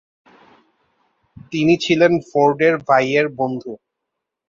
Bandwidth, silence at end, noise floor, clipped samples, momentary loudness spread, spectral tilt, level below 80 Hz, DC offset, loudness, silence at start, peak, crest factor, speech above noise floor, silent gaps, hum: 7.6 kHz; 0.75 s; -80 dBFS; under 0.1%; 14 LU; -6 dB/octave; -58 dBFS; under 0.1%; -17 LUFS; 1.5 s; -2 dBFS; 18 dB; 64 dB; none; none